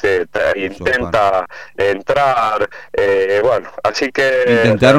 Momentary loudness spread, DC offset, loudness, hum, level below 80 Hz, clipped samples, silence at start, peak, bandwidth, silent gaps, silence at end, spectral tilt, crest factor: 7 LU; 0.8%; -15 LUFS; none; -44 dBFS; under 0.1%; 0.05 s; 0 dBFS; 14.5 kHz; none; 0 s; -5.5 dB/octave; 14 dB